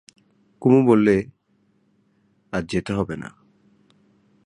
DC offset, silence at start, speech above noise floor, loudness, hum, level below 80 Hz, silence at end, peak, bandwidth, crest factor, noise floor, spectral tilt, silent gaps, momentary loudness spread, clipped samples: under 0.1%; 0.6 s; 45 dB; -20 LUFS; none; -52 dBFS; 1.2 s; -4 dBFS; 11 kHz; 20 dB; -64 dBFS; -7.5 dB/octave; none; 19 LU; under 0.1%